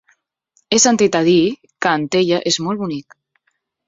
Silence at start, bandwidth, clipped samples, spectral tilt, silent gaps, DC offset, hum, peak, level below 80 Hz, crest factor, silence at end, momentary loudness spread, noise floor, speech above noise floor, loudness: 0.7 s; 8 kHz; under 0.1%; -3.5 dB/octave; none; under 0.1%; none; -2 dBFS; -58 dBFS; 16 dB; 0.85 s; 10 LU; -69 dBFS; 53 dB; -16 LUFS